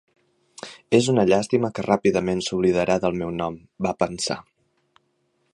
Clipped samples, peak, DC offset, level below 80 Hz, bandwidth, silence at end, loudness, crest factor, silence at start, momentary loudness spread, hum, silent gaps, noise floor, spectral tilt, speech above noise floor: under 0.1%; -2 dBFS; under 0.1%; -52 dBFS; 11.5 kHz; 1.1 s; -22 LUFS; 20 dB; 0.65 s; 12 LU; none; none; -69 dBFS; -5.5 dB/octave; 48 dB